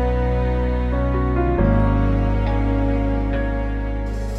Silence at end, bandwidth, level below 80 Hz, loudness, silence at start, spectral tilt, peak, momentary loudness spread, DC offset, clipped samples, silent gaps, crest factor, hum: 0 s; 5.4 kHz; -22 dBFS; -21 LUFS; 0 s; -9 dB/octave; -6 dBFS; 7 LU; under 0.1%; under 0.1%; none; 14 dB; none